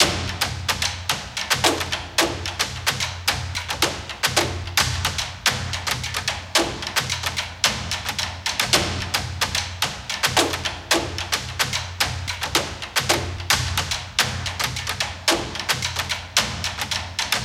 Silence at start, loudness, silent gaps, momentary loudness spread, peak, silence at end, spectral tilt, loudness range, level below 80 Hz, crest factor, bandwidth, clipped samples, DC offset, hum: 0 s; -22 LUFS; none; 6 LU; -2 dBFS; 0 s; -2 dB/octave; 1 LU; -40 dBFS; 22 dB; 17 kHz; under 0.1%; under 0.1%; none